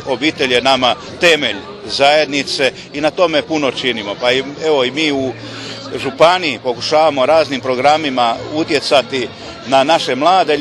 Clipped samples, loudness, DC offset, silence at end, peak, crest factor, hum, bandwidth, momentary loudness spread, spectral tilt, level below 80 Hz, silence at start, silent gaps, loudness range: under 0.1%; -14 LUFS; under 0.1%; 0 s; 0 dBFS; 14 dB; none; 12.5 kHz; 10 LU; -3.5 dB/octave; -52 dBFS; 0 s; none; 2 LU